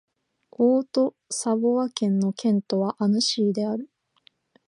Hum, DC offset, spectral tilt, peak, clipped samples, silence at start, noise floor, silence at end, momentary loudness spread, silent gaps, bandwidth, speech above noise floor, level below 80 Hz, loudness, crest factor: none; under 0.1%; -5.5 dB/octave; -10 dBFS; under 0.1%; 0.6 s; -62 dBFS; 0.8 s; 7 LU; none; 11.5 kHz; 39 dB; -76 dBFS; -24 LUFS; 16 dB